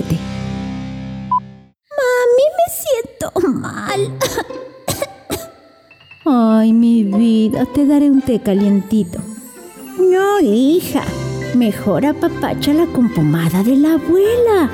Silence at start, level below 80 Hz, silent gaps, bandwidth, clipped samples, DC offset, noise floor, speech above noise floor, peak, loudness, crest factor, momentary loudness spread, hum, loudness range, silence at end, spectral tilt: 0 s; -44 dBFS; none; over 20 kHz; under 0.1%; under 0.1%; -46 dBFS; 32 dB; -6 dBFS; -15 LUFS; 10 dB; 14 LU; none; 5 LU; 0 s; -6 dB/octave